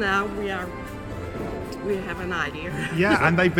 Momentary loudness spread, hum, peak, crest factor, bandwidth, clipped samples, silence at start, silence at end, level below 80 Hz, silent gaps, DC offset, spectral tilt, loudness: 14 LU; none; -4 dBFS; 20 dB; 17 kHz; under 0.1%; 0 s; 0 s; -44 dBFS; none; under 0.1%; -6 dB/octave; -26 LUFS